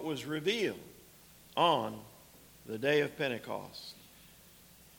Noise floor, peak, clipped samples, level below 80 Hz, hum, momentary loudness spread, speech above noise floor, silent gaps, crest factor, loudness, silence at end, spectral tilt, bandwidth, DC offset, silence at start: -58 dBFS; -14 dBFS; under 0.1%; -70 dBFS; none; 25 LU; 25 dB; none; 22 dB; -33 LUFS; 0.75 s; -4.5 dB/octave; 19 kHz; under 0.1%; 0 s